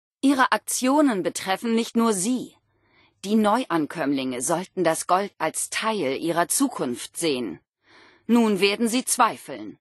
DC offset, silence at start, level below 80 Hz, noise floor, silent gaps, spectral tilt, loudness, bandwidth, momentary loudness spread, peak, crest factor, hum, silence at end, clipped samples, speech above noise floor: under 0.1%; 0.25 s; -72 dBFS; -62 dBFS; 7.69-7.73 s; -3.5 dB/octave; -23 LUFS; 12.5 kHz; 9 LU; -6 dBFS; 18 dB; none; 0.05 s; under 0.1%; 39 dB